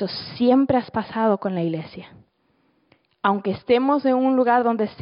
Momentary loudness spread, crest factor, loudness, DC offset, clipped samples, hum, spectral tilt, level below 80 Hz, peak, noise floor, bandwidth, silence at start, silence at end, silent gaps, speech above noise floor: 10 LU; 16 dB; -21 LUFS; under 0.1%; under 0.1%; none; -11 dB/octave; -60 dBFS; -6 dBFS; -65 dBFS; 5.4 kHz; 0 s; 0 s; none; 45 dB